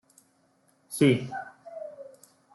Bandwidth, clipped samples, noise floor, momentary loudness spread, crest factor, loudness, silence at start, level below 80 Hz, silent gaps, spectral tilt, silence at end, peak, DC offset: 12.5 kHz; under 0.1%; -67 dBFS; 23 LU; 22 dB; -26 LUFS; 0.9 s; -72 dBFS; none; -6 dB/octave; 0.45 s; -10 dBFS; under 0.1%